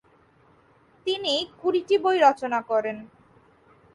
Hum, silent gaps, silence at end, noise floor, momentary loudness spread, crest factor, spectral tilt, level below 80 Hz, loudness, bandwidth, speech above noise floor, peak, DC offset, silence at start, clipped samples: none; none; 0.9 s; -59 dBFS; 13 LU; 20 dB; -3.5 dB/octave; -70 dBFS; -24 LUFS; 11.5 kHz; 36 dB; -6 dBFS; under 0.1%; 1.05 s; under 0.1%